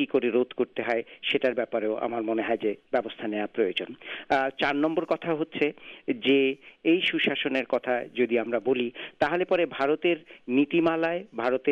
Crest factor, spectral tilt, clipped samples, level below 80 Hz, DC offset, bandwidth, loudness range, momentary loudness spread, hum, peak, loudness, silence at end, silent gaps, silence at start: 18 dB; -6.5 dB/octave; under 0.1%; -68 dBFS; under 0.1%; 7.4 kHz; 3 LU; 6 LU; none; -10 dBFS; -27 LUFS; 0 s; none; 0 s